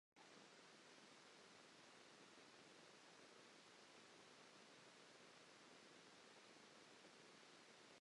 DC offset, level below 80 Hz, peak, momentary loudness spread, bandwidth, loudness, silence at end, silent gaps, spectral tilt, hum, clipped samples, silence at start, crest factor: under 0.1%; under -90 dBFS; -52 dBFS; 0 LU; 11 kHz; -66 LUFS; 0 s; none; -2 dB/octave; none; under 0.1%; 0.15 s; 16 dB